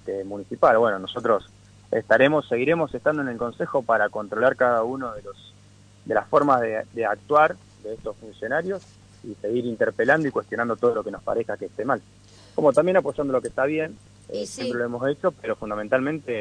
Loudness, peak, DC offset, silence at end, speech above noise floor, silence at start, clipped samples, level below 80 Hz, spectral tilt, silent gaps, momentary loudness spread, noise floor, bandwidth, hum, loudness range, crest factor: -23 LUFS; -6 dBFS; under 0.1%; 0 s; 28 dB; 0.05 s; under 0.1%; -58 dBFS; -6 dB/octave; none; 14 LU; -51 dBFS; 10.5 kHz; none; 4 LU; 18 dB